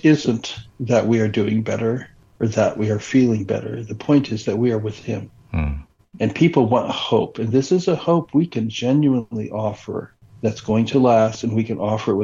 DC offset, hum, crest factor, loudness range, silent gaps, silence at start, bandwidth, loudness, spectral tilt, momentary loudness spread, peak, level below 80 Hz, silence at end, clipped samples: under 0.1%; none; 16 dB; 2 LU; none; 0.05 s; 7.6 kHz; -20 LUFS; -7 dB/octave; 12 LU; -2 dBFS; -44 dBFS; 0 s; under 0.1%